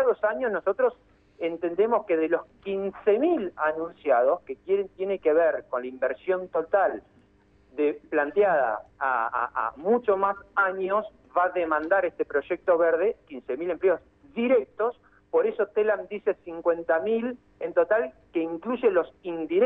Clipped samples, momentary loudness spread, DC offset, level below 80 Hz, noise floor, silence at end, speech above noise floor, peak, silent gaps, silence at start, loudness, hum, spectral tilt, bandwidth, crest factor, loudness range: under 0.1%; 8 LU; under 0.1%; -64 dBFS; -60 dBFS; 0 s; 35 dB; -10 dBFS; none; 0 s; -26 LUFS; none; -8.5 dB/octave; 3.9 kHz; 16 dB; 2 LU